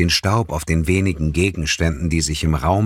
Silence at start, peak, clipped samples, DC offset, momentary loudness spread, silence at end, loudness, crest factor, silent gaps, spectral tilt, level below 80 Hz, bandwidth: 0 s; -4 dBFS; under 0.1%; under 0.1%; 3 LU; 0 s; -19 LUFS; 14 dB; none; -5 dB/octave; -28 dBFS; 16 kHz